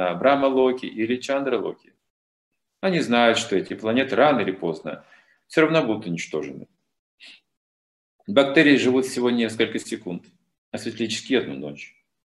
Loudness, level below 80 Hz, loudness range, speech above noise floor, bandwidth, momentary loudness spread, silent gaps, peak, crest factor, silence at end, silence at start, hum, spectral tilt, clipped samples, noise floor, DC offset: -22 LUFS; -68 dBFS; 5 LU; over 68 dB; 12.5 kHz; 17 LU; 2.10-2.51 s, 6.99-7.18 s, 7.57-8.19 s, 10.58-10.72 s; -2 dBFS; 22 dB; 0.5 s; 0 s; none; -5 dB/octave; under 0.1%; under -90 dBFS; under 0.1%